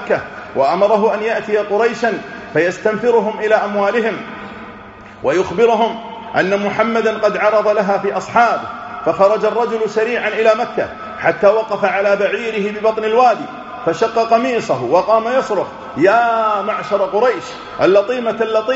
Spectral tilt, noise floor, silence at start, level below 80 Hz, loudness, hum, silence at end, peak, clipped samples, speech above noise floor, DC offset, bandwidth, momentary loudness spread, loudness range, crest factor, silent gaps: -3.5 dB/octave; -36 dBFS; 0 s; -54 dBFS; -16 LUFS; none; 0 s; 0 dBFS; under 0.1%; 21 dB; under 0.1%; 8 kHz; 9 LU; 2 LU; 16 dB; none